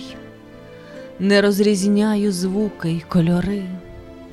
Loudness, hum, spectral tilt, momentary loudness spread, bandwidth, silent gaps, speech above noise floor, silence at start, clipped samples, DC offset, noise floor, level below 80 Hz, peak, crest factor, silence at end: -19 LUFS; none; -6 dB/octave; 23 LU; 13.5 kHz; none; 22 dB; 0 s; under 0.1%; under 0.1%; -40 dBFS; -46 dBFS; -2 dBFS; 18 dB; 0 s